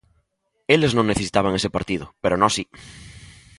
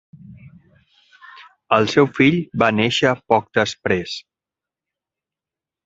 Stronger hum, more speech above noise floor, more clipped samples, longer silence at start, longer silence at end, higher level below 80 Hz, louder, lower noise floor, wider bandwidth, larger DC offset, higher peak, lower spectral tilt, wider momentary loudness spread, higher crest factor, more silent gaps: neither; second, 50 dB vs 70 dB; neither; first, 0.7 s vs 0.3 s; second, 0.35 s vs 1.65 s; first, -46 dBFS vs -54 dBFS; second, -21 LUFS vs -18 LUFS; second, -71 dBFS vs -88 dBFS; first, 11.5 kHz vs 8 kHz; neither; about the same, -2 dBFS vs 0 dBFS; about the same, -4.5 dB/octave vs -5.5 dB/octave; first, 21 LU vs 7 LU; about the same, 22 dB vs 22 dB; neither